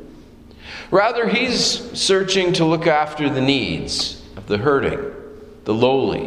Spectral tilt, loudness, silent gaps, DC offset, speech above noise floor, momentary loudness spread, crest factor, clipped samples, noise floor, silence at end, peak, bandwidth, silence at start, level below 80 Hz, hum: -4 dB/octave; -18 LUFS; none; under 0.1%; 24 dB; 14 LU; 18 dB; under 0.1%; -42 dBFS; 0 s; -2 dBFS; 13.5 kHz; 0 s; -44 dBFS; none